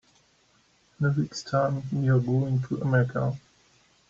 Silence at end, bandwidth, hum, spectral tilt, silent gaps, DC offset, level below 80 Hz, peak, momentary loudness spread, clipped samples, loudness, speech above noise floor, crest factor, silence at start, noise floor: 0.7 s; 7.6 kHz; none; -7.5 dB/octave; none; under 0.1%; -60 dBFS; -12 dBFS; 6 LU; under 0.1%; -26 LUFS; 39 dB; 16 dB; 1 s; -64 dBFS